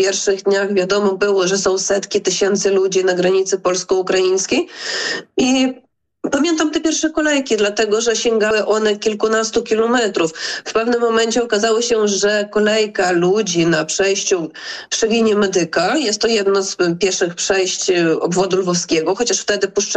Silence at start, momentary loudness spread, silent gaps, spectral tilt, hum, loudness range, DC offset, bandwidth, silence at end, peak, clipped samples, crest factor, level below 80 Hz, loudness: 0 s; 4 LU; none; -3 dB/octave; none; 2 LU; under 0.1%; 9.2 kHz; 0 s; -6 dBFS; under 0.1%; 10 dB; -54 dBFS; -16 LUFS